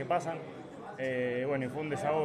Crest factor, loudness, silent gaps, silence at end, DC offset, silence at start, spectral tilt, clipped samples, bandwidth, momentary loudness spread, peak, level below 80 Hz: 16 dB; -34 LUFS; none; 0 s; under 0.1%; 0 s; -6.5 dB/octave; under 0.1%; 13 kHz; 13 LU; -18 dBFS; -70 dBFS